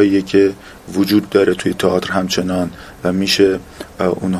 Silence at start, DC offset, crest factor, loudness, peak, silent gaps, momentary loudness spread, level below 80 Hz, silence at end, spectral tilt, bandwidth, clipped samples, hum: 0 s; under 0.1%; 16 dB; -16 LUFS; 0 dBFS; none; 11 LU; -42 dBFS; 0 s; -5 dB/octave; 15.5 kHz; under 0.1%; none